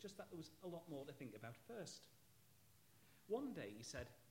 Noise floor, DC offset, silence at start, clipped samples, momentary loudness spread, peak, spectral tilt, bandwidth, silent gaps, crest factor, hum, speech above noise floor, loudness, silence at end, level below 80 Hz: -73 dBFS; under 0.1%; 0 s; under 0.1%; 10 LU; -34 dBFS; -5 dB/octave; 16.5 kHz; none; 20 dB; none; 20 dB; -53 LUFS; 0 s; -76 dBFS